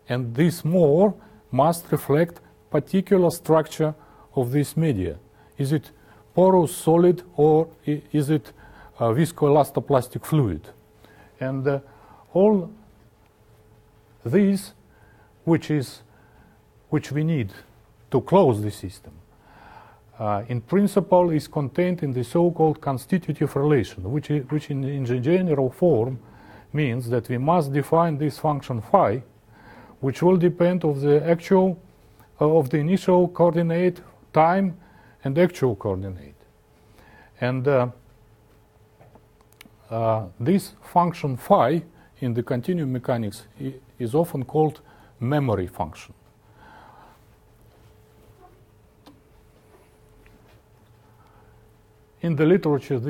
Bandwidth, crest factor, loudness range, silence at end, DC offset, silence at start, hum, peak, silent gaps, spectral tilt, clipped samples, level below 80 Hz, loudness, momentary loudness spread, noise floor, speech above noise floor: 17.5 kHz; 20 dB; 6 LU; 0 s; under 0.1%; 0.1 s; none; -2 dBFS; none; -7.5 dB/octave; under 0.1%; -56 dBFS; -22 LUFS; 12 LU; -56 dBFS; 34 dB